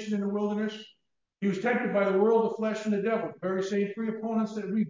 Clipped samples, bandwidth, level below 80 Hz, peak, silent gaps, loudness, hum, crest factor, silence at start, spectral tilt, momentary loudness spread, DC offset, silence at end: under 0.1%; 7.6 kHz; -78 dBFS; -12 dBFS; none; -29 LUFS; none; 16 dB; 0 s; -7 dB/octave; 8 LU; under 0.1%; 0 s